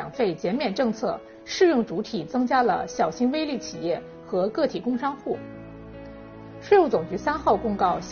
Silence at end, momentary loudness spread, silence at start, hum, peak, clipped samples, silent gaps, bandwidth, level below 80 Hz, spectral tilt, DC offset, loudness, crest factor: 0 s; 20 LU; 0 s; none; -6 dBFS; under 0.1%; none; 6.8 kHz; -54 dBFS; -4 dB/octave; under 0.1%; -25 LUFS; 18 dB